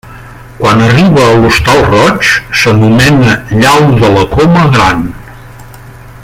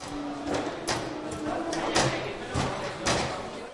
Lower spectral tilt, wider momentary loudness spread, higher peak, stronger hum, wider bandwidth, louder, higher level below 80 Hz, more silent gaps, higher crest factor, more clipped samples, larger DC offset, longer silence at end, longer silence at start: first, -5.5 dB/octave vs -4 dB/octave; second, 4 LU vs 9 LU; first, 0 dBFS vs -10 dBFS; neither; first, 16 kHz vs 11.5 kHz; first, -6 LUFS vs -30 LUFS; first, -28 dBFS vs -50 dBFS; neither; second, 8 dB vs 20 dB; first, 0.3% vs under 0.1%; neither; about the same, 0 s vs 0 s; about the same, 0.05 s vs 0 s